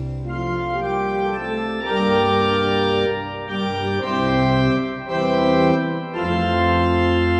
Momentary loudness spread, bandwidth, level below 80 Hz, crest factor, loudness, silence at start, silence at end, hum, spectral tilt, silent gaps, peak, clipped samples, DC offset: 7 LU; 8.8 kHz; -38 dBFS; 14 dB; -20 LUFS; 0 s; 0 s; none; -7 dB/octave; none; -6 dBFS; under 0.1%; under 0.1%